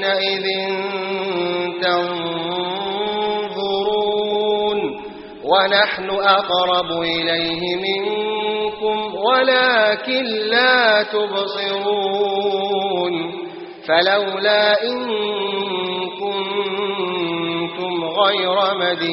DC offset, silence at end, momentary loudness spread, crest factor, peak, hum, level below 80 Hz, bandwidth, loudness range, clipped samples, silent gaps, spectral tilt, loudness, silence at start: under 0.1%; 0 s; 8 LU; 18 dB; -2 dBFS; none; -60 dBFS; 5.8 kHz; 5 LU; under 0.1%; none; -0.5 dB/octave; -18 LUFS; 0 s